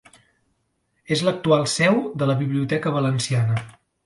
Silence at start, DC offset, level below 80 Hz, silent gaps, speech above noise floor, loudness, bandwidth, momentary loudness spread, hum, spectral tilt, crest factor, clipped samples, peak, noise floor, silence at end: 1.1 s; under 0.1%; -60 dBFS; none; 50 dB; -21 LUFS; 11.5 kHz; 5 LU; none; -5.5 dB/octave; 18 dB; under 0.1%; -4 dBFS; -70 dBFS; 0.35 s